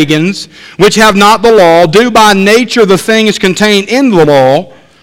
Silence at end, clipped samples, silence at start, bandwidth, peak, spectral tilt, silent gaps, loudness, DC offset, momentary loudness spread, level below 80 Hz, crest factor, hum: 0.35 s; 4%; 0 s; 17 kHz; 0 dBFS; -4.5 dB/octave; none; -6 LUFS; under 0.1%; 6 LU; -38 dBFS; 6 dB; none